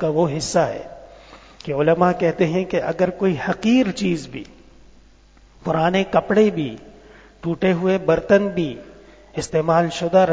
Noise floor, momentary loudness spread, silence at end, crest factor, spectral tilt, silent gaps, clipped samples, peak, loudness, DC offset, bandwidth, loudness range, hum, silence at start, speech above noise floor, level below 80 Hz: -50 dBFS; 15 LU; 0 s; 18 dB; -6 dB/octave; none; under 0.1%; -2 dBFS; -20 LUFS; under 0.1%; 8 kHz; 3 LU; none; 0 s; 31 dB; -50 dBFS